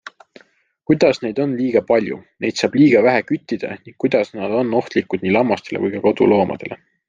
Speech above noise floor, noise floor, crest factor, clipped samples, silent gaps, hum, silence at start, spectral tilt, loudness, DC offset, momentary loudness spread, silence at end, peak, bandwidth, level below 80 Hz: 38 dB; -55 dBFS; 16 dB; under 0.1%; none; none; 0.9 s; -6.5 dB/octave; -18 LUFS; under 0.1%; 11 LU; 0.35 s; -2 dBFS; 7.6 kHz; -58 dBFS